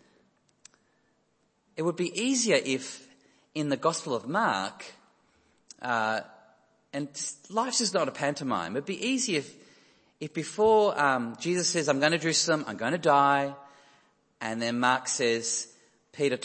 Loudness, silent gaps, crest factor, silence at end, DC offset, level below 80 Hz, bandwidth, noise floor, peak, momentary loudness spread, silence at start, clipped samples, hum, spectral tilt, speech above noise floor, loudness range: -27 LUFS; none; 22 dB; 0 s; under 0.1%; -74 dBFS; 8.8 kHz; -71 dBFS; -6 dBFS; 14 LU; 1.8 s; under 0.1%; none; -3 dB/octave; 44 dB; 6 LU